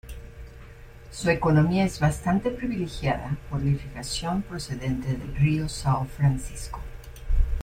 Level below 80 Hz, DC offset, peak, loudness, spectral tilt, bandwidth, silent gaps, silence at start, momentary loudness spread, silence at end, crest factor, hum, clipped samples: -34 dBFS; under 0.1%; -8 dBFS; -26 LUFS; -6.5 dB/octave; 15.5 kHz; none; 0.05 s; 19 LU; 0 s; 18 dB; none; under 0.1%